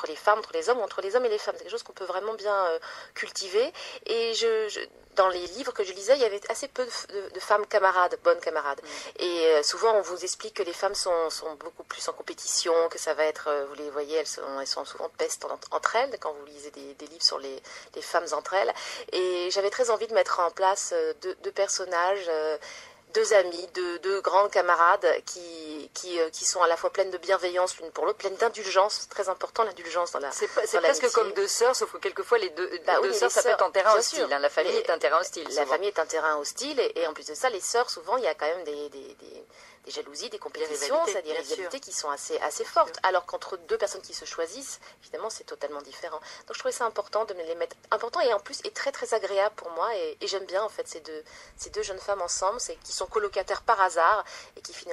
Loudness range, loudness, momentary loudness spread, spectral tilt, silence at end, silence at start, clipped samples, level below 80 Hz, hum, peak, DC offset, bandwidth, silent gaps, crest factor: 7 LU; -27 LUFS; 14 LU; -0.5 dB/octave; 0 s; 0 s; under 0.1%; -68 dBFS; none; -4 dBFS; under 0.1%; 13.5 kHz; none; 22 dB